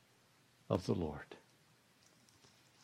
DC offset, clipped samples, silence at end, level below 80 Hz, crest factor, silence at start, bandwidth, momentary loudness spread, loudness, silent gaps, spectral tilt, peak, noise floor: under 0.1%; under 0.1%; 1.45 s; -68 dBFS; 24 dB; 0.7 s; 15.5 kHz; 19 LU; -40 LUFS; none; -7 dB/octave; -20 dBFS; -70 dBFS